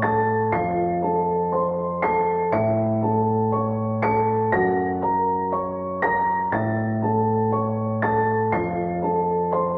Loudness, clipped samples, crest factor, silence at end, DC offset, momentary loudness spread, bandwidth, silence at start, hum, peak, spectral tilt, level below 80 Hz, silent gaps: -22 LUFS; under 0.1%; 14 dB; 0 s; under 0.1%; 3 LU; 4.8 kHz; 0 s; none; -8 dBFS; -11.5 dB/octave; -52 dBFS; none